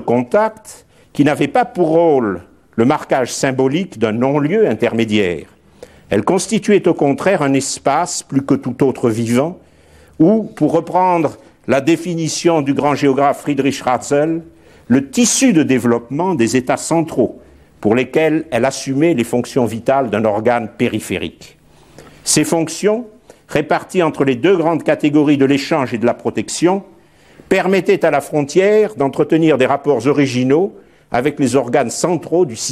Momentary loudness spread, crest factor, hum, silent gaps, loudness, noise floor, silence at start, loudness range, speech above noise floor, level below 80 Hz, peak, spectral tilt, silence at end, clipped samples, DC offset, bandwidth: 6 LU; 14 dB; none; none; -15 LUFS; -46 dBFS; 0 s; 2 LU; 32 dB; -52 dBFS; 0 dBFS; -5 dB/octave; 0 s; under 0.1%; under 0.1%; 15 kHz